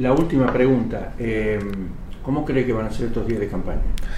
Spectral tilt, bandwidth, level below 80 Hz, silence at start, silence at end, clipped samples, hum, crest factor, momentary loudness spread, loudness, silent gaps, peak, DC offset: -8 dB/octave; 12 kHz; -28 dBFS; 0 s; 0 s; under 0.1%; none; 16 dB; 11 LU; -22 LUFS; none; -4 dBFS; under 0.1%